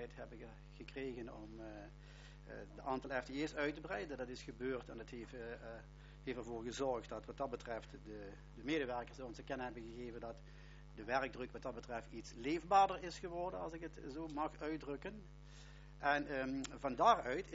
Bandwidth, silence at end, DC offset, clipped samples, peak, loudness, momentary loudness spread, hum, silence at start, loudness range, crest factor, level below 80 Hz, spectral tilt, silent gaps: 7.6 kHz; 0 s; under 0.1%; under 0.1%; -18 dBFS; -42 LUFS; 19 LU; none; 0 s; 6 LU; 24 dB; -60 dBFS; -3.5 dB/octave; none